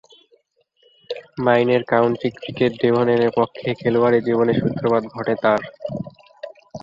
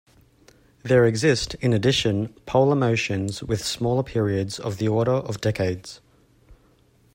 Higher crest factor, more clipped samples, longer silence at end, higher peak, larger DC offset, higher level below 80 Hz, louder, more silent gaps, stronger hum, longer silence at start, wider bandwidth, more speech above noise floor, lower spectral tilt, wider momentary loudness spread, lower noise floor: about the same, 18 dB vs 18 dB; neither; second, 0.05 s vs 0.6 s; first, -2 dBFS vs -6 dBFS; neither; second, -56 dBFS vs -50 dBFS; first, -19 LUFS vs -23 LUFS; neither; neither; first, 1.1 s vs 0.85 s; second, 7.2 kHz vs 16 kHz; first, 44 dB vs 37 dB; first, -8 dB/octave vs -5.5 dB/octave; first, 16 LU vs 8 LU; first, -63 dBFS vs -59 dBFS